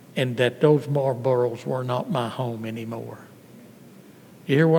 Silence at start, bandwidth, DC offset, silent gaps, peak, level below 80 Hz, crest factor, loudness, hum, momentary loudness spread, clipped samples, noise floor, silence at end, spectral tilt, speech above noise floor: 0.15 s; 19 kHz; under 0.1%; none; -4 dBFS; -76 dBFS; 20 dB; -24 LUFS; none; 15 LU; under 0.1%; -48 dBFS; 0 s; -7.5 dB/octave; 25 dB